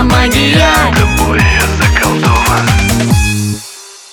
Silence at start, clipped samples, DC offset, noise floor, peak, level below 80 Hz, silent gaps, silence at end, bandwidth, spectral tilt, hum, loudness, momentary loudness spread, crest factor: 0 s; under 0.1%; under 0.1%; -31 dBFS; 0 dBFS; -18 dBFS; none; 0.15 s; 20 kHz; -4.5 dB/octave; none; -9 LUFS; 9 LU; 10 dB